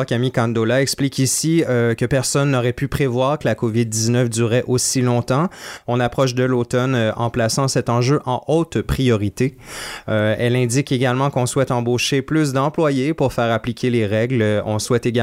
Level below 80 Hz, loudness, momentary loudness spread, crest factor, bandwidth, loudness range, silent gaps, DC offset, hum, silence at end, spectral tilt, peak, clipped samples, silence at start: -42 dBFS; -18 LUFS; 3 LU; 14 dB; 16 kHz; 1 LU; none; under 0.1%; none; 0 s; -5 dB/octave; -6 dBFS; under 0.1%; 0 s